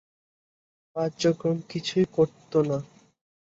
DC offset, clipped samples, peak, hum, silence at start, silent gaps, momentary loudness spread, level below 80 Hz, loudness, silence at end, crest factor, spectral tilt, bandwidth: under 0.1%; under 0.1%; -10 dBFS; none; 0.95 s; none; 7 LU; -64 dBFS; -26 LUFS; 0.65 s; 18 dB; -6 dB/octave; 8 kHz